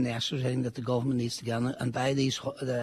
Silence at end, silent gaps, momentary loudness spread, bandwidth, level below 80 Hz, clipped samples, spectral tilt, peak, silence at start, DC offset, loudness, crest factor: 0 s; none; 4 LU; 13.5 kHz; -62 dBFS; under 0.1%; -5.5 dB/octave; -16 dBFS; 0 s; under 0.1%; -30 LUFS; 14 dB